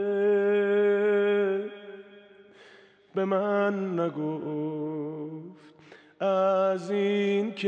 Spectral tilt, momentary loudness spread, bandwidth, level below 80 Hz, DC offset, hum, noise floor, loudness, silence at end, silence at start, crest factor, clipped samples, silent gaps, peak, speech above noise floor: -7.5 dB/octave; 16 LU; 8 kHz; -88 dBFS; under 0.1%; none; -55 dBFS; -27 LUFS; 0 s; 0 s; 14 dB; under 0.1%; none; -14 dBFS; 28 dB